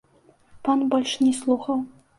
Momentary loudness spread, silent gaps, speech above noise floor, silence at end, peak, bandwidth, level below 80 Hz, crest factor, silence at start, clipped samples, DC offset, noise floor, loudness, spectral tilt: 7 LU; none; 36 dB; 0.3 s; -8 dBFS; 11.5 kHz; -64 dBFS; 16 dB; 0.55 s; under 0.1%; under 0.1%; -58 dBFS; -23 LUFS; -3.5 dB/octave